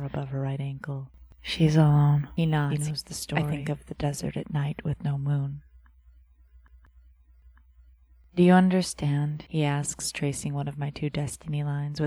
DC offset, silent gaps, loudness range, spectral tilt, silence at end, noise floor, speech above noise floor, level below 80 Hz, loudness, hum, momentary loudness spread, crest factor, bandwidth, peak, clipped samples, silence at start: under 0.1%; none; 8 LU; -6 dB/octave; 0 s; -56 dBFS; 30 dB; -52 dBFS; -27 LUFS; none; 14 LU; 20 dB; 13 kHz; -8 dBFS; under 0.1%; 0 s